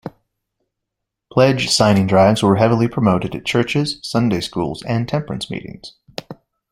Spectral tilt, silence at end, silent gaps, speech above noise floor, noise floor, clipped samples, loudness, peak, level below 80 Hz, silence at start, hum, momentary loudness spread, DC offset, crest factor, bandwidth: -5.5 dB/octave; 0.4 s; none; 64 dB; -80 dBFS; under 0.1%; -17 LUFS; 0 dBFS; -48 dBFS; 0.05 s; none; 19 LU; under 0.1%; 18 dB; 15 kHz